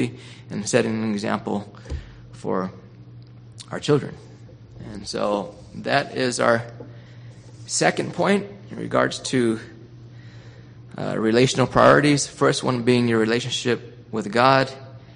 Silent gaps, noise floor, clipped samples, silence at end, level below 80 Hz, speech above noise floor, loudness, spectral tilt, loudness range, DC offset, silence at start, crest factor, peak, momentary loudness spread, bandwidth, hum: none; -43 dBFS; under 0.1%; 0.05 s; -50 dBFS; 22 dB; -21 LUFS; -4.5 dB/octave; 9 LU; under 0.1%; 0 s; 22 dB; 0 dBFS; 24 LU; 10 kHz; none